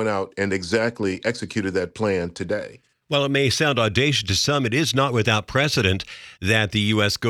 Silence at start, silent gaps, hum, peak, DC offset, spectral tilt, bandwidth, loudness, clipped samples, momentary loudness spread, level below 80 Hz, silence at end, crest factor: 0 s; none; none; -2 dBFS; under 0.1%; -4.5 dB/octave; 18 kHz; -21 LUFS; under 0.1%; 8 LU; -52 dBFS; 0 s; 18 dB